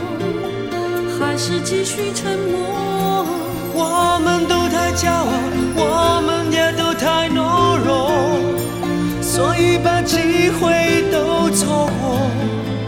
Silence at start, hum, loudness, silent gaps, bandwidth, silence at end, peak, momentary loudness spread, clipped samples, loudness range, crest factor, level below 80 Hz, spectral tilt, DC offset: 0 s; none; -17 LUFS; none; 17.5 kHz; 0 s; -2 dBFS; 6 LU; under 0.1%; 4 LU; 14 dB; -40 dBFS; -4.5 dB/octave; 0.1%